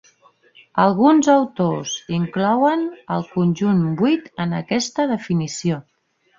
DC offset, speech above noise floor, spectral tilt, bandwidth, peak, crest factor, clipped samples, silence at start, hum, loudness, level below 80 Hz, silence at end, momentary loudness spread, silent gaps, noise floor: under 0.1%; 36 dB; -6 dB/octave; 7.6 kHz; -2 dBFS; 18 dB; under 0.1%; 0.75 s; none; -19 LUFS; -60 dBFS; 0.6 s; 10 LU; none; -55 dBFS